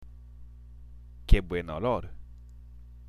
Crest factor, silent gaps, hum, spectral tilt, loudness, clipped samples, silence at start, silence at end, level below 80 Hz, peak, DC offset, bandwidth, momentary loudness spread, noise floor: 24 dB; none; 60 Hz at -50 dBFS; -7.5 dB/octave; -30 LUFS; under 0.1%; 0 s; 0.15 s; -32 dBFS; -6 dBFS; under 0.1%; 11 kHz; 24 LU; -47 dBFS